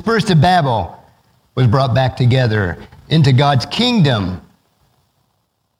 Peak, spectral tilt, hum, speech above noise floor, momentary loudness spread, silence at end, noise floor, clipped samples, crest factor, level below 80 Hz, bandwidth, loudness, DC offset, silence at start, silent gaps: 0 dBFS; -6.5 dB/octave; none; 53 dB; 13 LU; 1.4 s; -66 dBFS; under 0.1%; 16 dB; -42 dBFS; 11 kHz; -14 LUFS; under 0.1%; 0.05 s; none